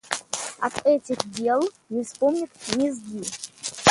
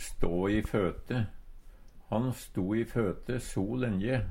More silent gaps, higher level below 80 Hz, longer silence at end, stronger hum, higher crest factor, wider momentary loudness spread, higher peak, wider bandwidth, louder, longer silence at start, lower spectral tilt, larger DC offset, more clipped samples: neither; second, -60 dBFS vs -42 dBFS; about the same, 0 s vs 0 s; neither; first, 24 dB vs 16 dB; first, 10 LU vs 6 LU; first, 0 dBFS vs -16 dBFS; second, 11.5 kHz vs 16.5 kHz; first, -26 LUFS vs -32 LUFS; about the same, 0.05 s vs 0 s; second, -3 dB/octave vs -7 dB/octave; neither; neither